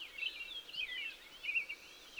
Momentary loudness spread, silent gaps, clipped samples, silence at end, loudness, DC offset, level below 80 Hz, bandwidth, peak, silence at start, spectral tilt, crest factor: 8 LU; none; under 0.1%; 0 s; -40 LUFS; under 0.1%; -72 dBFS; over 20 kHz; -26 dBFS; 0 s; 0.5 dB/octave; 18 dB